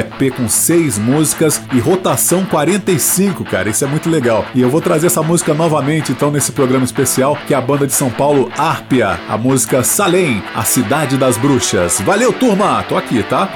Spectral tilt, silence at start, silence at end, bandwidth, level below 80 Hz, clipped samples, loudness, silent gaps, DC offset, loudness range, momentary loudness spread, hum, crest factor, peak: -4.5 dB/octave; 0 s; 0 s; 18 kHz; -48 dBFS; under 0.1%; -13 LUFS; none; under 0.1%; 1 LU; 4 LU; none; 12 dB; -2 dBFS